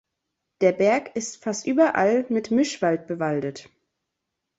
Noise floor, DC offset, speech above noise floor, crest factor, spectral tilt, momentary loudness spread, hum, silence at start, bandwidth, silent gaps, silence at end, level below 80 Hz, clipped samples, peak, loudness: -82 dBFS; under 0.1%; 59 dB; 18 dB; -5 dB/octave; 10 LU; none; 0.6 s; 8.2 kHz; none; 0.95 s; -68 dBFS; under 0.1%; -6 dBFS; -23 LUFS